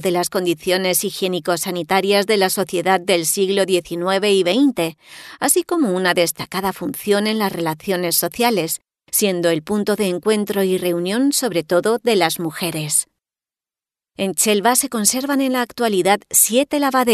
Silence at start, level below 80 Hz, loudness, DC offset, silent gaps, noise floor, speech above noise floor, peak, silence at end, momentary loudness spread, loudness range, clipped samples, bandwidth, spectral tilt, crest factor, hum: 0 s; -60 dBFS; -18 LUFS; under 0.1%; none; under -90 dBFS; over 72 dB; -2 dBFS; 0 s; 7 LU; 2 LU; under 0.1%; 14 kHz; -3 dB/octave; 18 dB; none